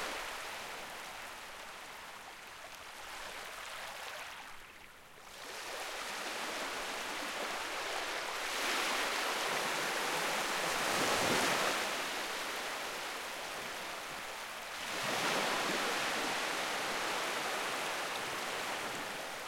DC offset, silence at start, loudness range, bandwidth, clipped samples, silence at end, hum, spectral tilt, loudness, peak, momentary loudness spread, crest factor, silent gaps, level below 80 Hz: under 0.1%; 0 s; 12 LU; 16.5 kHz; under 0.1%; 0 s; none; -1 dB/octave; -36 LUFS; -20 dBFS; 14 LU; 18 dB; none; -68 dBFS